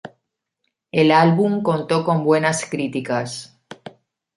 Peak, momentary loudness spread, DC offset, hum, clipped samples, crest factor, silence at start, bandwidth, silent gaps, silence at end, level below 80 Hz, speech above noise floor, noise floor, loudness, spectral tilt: -2 dBFS; 24 LU; under 0.1%; none; under 0.1%; 18 dB; 0.05 s; 11.5 kHz; none; 0.5 s; -64 dBFS; 58 dB; -76 dBFS; -18 LUFS; -5.5 dB/octave